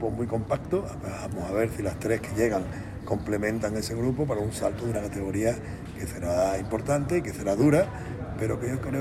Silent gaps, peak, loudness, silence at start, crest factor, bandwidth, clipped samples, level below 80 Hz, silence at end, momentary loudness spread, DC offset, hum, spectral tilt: none; -8 dBFS; -28 LUFS; 0 s; 18 dB; 15.5 kHz; under 0.1%; -44 dBFS; 0 s; 10 LU; under 0.1%; none; -6.5 dB/octave